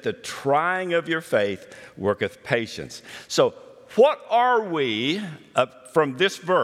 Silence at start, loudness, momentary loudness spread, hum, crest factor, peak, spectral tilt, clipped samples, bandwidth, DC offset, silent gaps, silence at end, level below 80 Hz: 0.05 s; -23 LUFS; 10 LU; none; 20 dB; -4 dBFS; -4.5 dB/octave; under 0.1%; 15 kHz; under 0.1%; none; 0 s; -68 dBFS